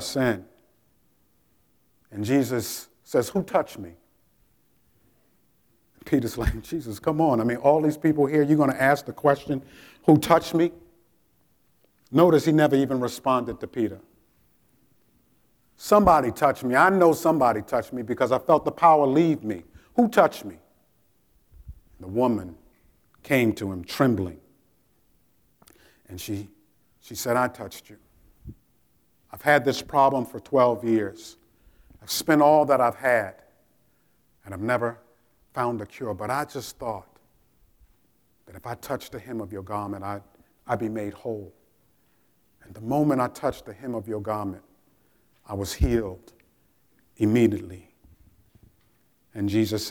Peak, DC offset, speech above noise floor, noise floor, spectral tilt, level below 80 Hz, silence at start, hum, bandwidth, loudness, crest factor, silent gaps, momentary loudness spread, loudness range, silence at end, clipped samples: -4 dBFS; under 0.1%; 43 dB; -66 dBFS; -6 dB/octave; -46 dBFS; 0 s; none; 19.5 kHz; -24 LUFS; 22 dB; none; 18 LU; 11 LU; 0 s; under 0.1%